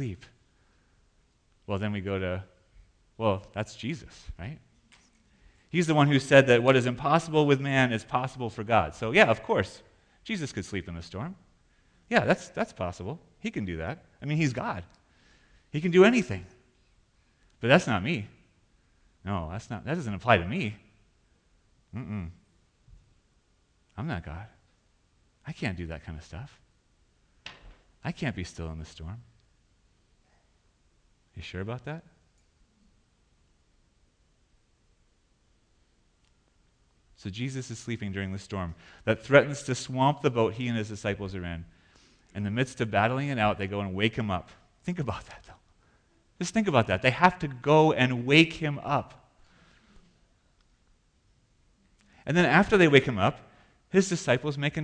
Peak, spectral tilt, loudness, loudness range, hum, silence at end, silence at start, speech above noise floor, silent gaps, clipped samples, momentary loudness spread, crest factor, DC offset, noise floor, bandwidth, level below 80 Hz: -6 dBFS; -6 dB/octave; -27 LUFS; 18 LU; none; 0 s; 0 s; 41 dB; none; under 0.1%; 21 LU; 24 dB; under 0.1%; -68 dBFS; 10 kHz; -54 dBFS